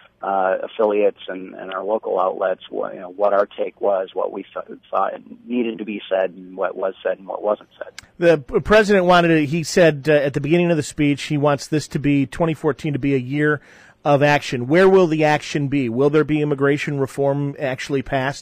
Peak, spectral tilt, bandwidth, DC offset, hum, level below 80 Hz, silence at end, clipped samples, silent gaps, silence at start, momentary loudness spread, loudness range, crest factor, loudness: -4 dBFS; -6 dB/octave; 15.5 kHz; under 0.1%; none; -48 dBFS; 0 s; under 0.1%; none; 0.2 s; 12 LU; 8 LU; 16 dB; -19 LUFS